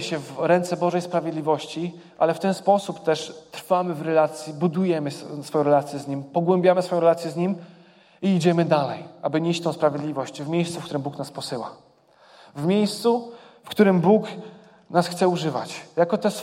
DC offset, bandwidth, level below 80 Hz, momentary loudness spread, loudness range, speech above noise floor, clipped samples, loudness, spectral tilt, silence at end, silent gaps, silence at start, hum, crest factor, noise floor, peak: under 0.1%; 16 kHz; -72 dBFS; 12 LU; 5 LU; 32 dB; under 0.1%; -23 LUFS; -6.5 dB/octave; 0 s; none; 0 s; none; 20 dB; -55 dBFS; -4 dBFS